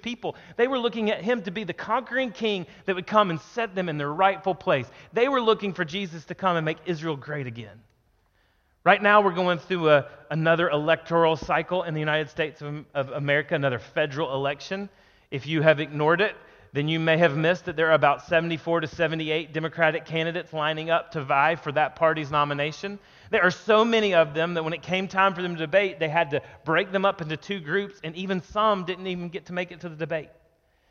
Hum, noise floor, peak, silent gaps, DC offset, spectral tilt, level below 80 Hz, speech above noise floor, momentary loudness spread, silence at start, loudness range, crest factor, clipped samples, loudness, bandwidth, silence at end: none; -66 dBFS; -2 dBFS; none; under 0.1%; -6 dB/octave; -60 dBFS; 41 dB; 11 LU; 0.05 s; 5 LU; 22 dB; under 0.1%; -25 LUFS; 7.2 kHz; 0.65 s